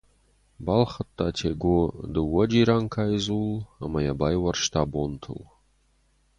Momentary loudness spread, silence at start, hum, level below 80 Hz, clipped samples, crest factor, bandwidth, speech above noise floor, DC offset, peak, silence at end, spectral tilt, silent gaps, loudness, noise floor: 11 LU; 0.6 s; none; -42 dBFS; under 0.1%; 20 dB; 10.5 kHz; 40 dB; under 0.1%; -6 dBFS; 0.95 s; -6 dB/octave; none; -25 LUFS; -65 dBFS